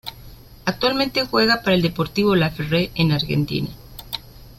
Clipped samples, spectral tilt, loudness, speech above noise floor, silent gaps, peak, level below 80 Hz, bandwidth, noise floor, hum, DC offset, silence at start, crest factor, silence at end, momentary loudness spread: under 0.1%; -6 dB/octave; -20 LUFS; 22 dB; none; -4 dBFS; -44 dBFS; 16.5 kHz; -42 dBFS; none; under 0.1%; 0.05 s; 18 dB; 0.05 s; 14 LU